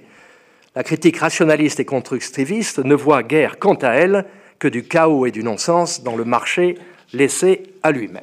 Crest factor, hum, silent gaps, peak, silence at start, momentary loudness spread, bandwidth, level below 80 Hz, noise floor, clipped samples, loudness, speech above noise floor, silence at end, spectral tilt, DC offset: 16 dB; none; none; -2 dBFS; 0.75 s; 8 LU; 15 kHz; -68 dBFS; -51 dBFS; under 0.1%; -17 LUFS; 34 dB; 0 s; -5 dB/octave; under 0.1%